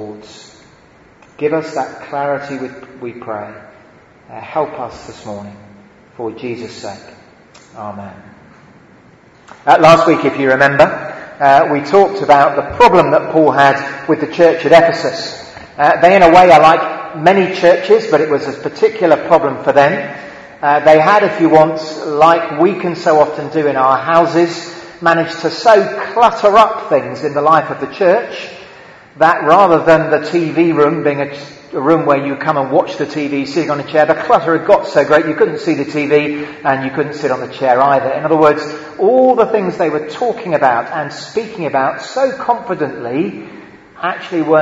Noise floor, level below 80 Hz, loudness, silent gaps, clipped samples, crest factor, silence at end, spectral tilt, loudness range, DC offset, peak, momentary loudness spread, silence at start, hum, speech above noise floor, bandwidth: -45 dBFS; -50 dBFS; -12 LUFS; none; 0.6%; 12 dB; 0 s; -6 dB/octave; 16 LU; under 0.1%; 0 dBFS; 17 LU; 0 s; none; 33 dB; 9 kHz